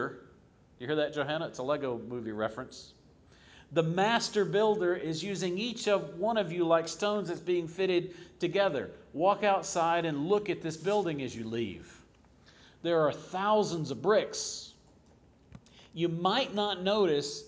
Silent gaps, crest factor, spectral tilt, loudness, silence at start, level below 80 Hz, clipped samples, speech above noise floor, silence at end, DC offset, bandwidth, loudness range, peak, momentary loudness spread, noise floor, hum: none; 18 dB; -4.5 dB/octave; -31 LUFS; 0 s; -66 dBFS; under 0.1%; 31 dB; 0 s; under 0.1%; 8 kHz; 4 LU; -12 dBFS; 10 LU; -61 dBFS; none